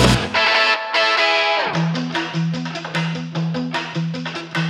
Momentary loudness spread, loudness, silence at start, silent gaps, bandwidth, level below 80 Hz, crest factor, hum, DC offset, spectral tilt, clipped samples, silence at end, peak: 10 LU; -19 LUFS; 0 s; none; 13 kHz; -38 dBFS; 18 dB; none; under 0.1%; -4.5 dB/octave; under 0.1%; 0 s; -2 dBFS